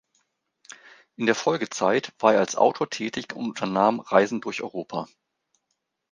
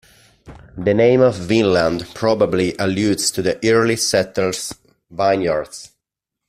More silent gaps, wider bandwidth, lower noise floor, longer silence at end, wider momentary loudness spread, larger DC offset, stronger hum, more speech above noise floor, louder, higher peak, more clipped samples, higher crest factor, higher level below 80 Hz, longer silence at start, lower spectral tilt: neither; second, 10 kHz vs 15.5 kHz; second, -78 dBFS vs -82 dBFS; first, 1.05 s vs 0.65 s; about the same, 12 LU vs 11 LU; neither; neither; second, 54 dB vs 65 dB; second, -24 LUFS vs -17 LUFS; about the same, -2 dBFS vs -2 dBFS; neither; first, 22 dB vs 16 dB; second, -72 dBFS vs -50 dBFS; first, 1.2 s vs 0.45 s; about the same, -4.5 dB/octave vs -4.5 dB/octave